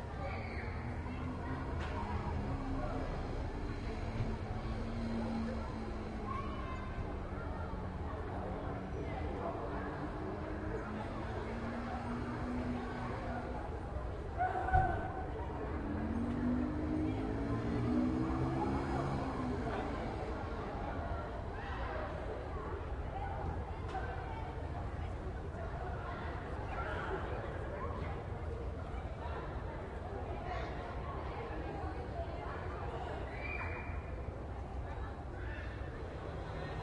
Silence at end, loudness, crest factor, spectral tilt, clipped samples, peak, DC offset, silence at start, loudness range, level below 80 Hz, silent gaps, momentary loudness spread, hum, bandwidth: 0 s; -40 LUFS; 22 dB; -8 dB/octave; under 0.1%; -16 dBFS; under 0.1%; 0 s; 6 LU; -46 dBFS; none; 7 LU; none; 10.5 kHz